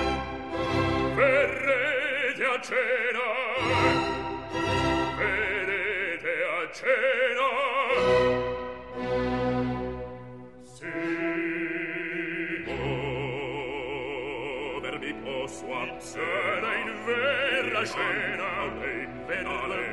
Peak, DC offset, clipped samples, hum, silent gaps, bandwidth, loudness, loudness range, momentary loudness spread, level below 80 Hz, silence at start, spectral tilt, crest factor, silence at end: -10 dBFS; 0.2%; under 0.1%; none; none; 12 kHz; -27 LUFS; 6 LU; 10 LU; -48 dBFS; 0 s; -5 dB/octave; 18 dB; 0 s